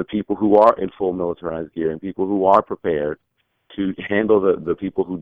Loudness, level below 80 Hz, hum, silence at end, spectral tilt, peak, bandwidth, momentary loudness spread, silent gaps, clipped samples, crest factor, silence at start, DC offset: -20 LUFS; -52 dBFS; none; 0 s; -9 dB/octave; -2 dBFS; 5.2 kHz; 12 LU; none; under 0.1%; 18 dB; 0 s; under 0.1%